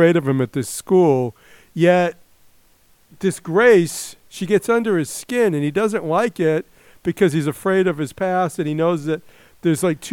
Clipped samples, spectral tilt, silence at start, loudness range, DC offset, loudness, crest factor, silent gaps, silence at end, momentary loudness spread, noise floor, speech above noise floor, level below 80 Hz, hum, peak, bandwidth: under 0.1%; -6 dB/octave; 0 s; 2 LU; under 0.1%; -19 LUFS; 18 dB; none; 0 s; 10 LU; -55 dBFS; 37 dB; -58 dBFS; none; -2 dBFS; 17 kHz